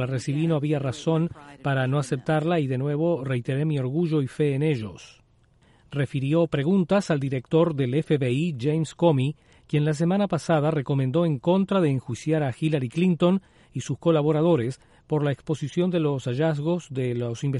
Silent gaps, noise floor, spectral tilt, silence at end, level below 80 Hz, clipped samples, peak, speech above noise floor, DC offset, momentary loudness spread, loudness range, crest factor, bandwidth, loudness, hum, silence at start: none; -59 dBFS; -7.5 dB/octave; 0 s; -58 dBFS; under 0.1%; -8 dBFS; 36 dB; under 0.1%; 7 LU; 2 LU; 16 dB; 11.5 kHz; -24 LUFS; none; 0 s